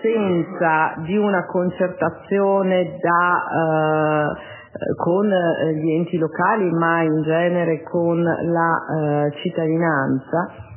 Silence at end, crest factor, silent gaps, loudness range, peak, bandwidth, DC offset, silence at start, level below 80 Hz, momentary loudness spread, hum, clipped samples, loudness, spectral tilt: 0 s; 14 dB; none; 1 LU; -4 dBFS; 3.2 kHz; under 0.1%; 0 s; -58 dBFS; 5 LU; none; under 0.1%; -20 LUFS; -11 dB/octave